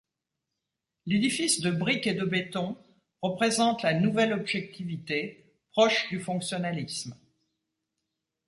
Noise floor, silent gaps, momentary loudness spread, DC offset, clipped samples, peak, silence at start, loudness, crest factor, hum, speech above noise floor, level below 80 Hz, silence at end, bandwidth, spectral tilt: -86 dBFS; none; 12 LU; under 0.1%; under 0.1%; -10 dBFS; 1.05 s; -28 LUFS; 20 dB; none; 58 dB; -68 dBFS; 1.35 s; 11.5 kHz; -4 dB/octave